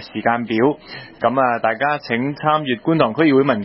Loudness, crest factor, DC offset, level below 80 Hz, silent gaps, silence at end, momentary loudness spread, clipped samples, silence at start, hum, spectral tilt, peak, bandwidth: -18 LUFS; 16 dB; under 0.1%; -58 dBFS; none; 0 s; 7 LU; under 0.1%; 0 s; none; -11 dB/octave; -2 dBFS; 5.8 kHz